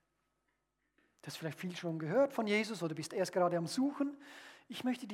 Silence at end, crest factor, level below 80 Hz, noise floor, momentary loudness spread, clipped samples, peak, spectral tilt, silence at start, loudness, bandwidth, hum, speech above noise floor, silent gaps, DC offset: 0 s; 16 dB; -90 dBFS; -83 dBFS; 17 LU; under 0.1%; -20 dBFS; -5.5 dB/octave; 1.25 s; -36 LUFS; 16 kHz; none; 47 dB; none; under 0.1%